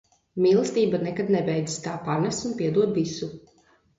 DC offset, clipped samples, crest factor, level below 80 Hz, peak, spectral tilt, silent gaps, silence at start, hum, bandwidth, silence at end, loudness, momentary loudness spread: under 0.1%; under 0.1%; 16 dB; -62 dBFS; -10 dBFS; -6 dB/octave; none; 0.35 s; none; 8 kHz; 0.6 s; -25 LUFS; 9 LU